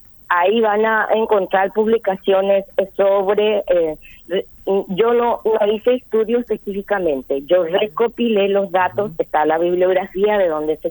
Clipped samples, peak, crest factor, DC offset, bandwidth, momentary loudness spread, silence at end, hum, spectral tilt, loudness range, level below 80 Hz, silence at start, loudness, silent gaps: under 0.1%; -2 dBFS; 14 dB; under 0.1%; over 20 kHz; 6 LU; 0 s; none; -7 dB/octave; 2 LU; -52 dBFS; 0.3 s; -17 LUFS; none